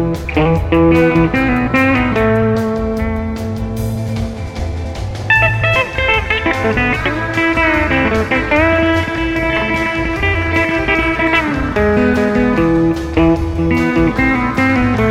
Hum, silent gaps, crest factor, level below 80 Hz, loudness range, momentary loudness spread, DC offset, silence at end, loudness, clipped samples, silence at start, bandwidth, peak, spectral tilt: none; none; 14 dB; -26 dBFS; 3 LU; 9 LU; 0.1%; 0 s; -14 LUFS; under 0.1%; 0 s; 15 kHz; 0 dBFS; -7 dB/octave